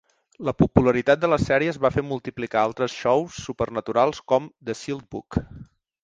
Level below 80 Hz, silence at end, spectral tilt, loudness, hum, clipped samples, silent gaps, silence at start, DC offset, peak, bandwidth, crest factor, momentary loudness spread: -44 dBFS; 0.4 s; -6.5 dB/octave; -23 LUFS; none; under 0.1%; none; 0.4 s; under 0.1%; -2 dBFS; 9.4 kHz; 22 dB; 12 LU